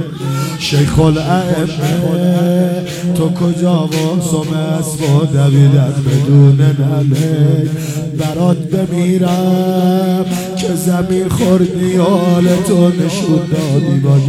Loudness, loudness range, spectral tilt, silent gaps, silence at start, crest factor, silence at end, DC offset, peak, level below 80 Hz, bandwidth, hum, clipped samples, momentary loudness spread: -13 LUFS; 3 LU; -7 dB/octave; none; 0 s; 12 dB; 0 s; under 0.1%; 0 dBFS; -40 dBFS; 14.5 kHz; none; under 0.1%; 7 LU